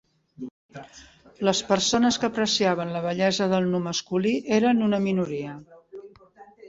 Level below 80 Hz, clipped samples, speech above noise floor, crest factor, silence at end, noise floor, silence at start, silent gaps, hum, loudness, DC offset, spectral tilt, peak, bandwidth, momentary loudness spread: -62 dBFS; under 0.1%; 27 dB; 20 dB; 0 s; -51 dBFS; 0.4 s; 0.51-0.69 s; none; -24 LUFS; under 0.1%; -4.5 dB/octave; -6 dBFS; 8 kHz; 22 LU